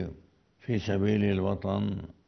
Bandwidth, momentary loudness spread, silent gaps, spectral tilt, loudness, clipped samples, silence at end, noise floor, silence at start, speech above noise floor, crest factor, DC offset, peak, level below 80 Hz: 6.4 kHz; 10 LU; none; -8 dB/octave; -29 LUFS; under 0.1%; 0.15 s; -59 dBFS; 0 s; 30 dB; 16 dB; under 0.1%; -14 dBFS; -54 dBFS